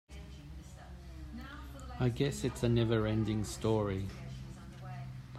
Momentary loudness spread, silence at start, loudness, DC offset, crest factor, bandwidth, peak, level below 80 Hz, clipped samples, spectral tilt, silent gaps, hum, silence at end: 19 LU; 0.1 s; -34 LUFS; under 0.1%; 18 dB; 15 kHz; -18 dBFS; -50 dBFS; under 0.1%; -6.5 dB/octave; none; none; 0 s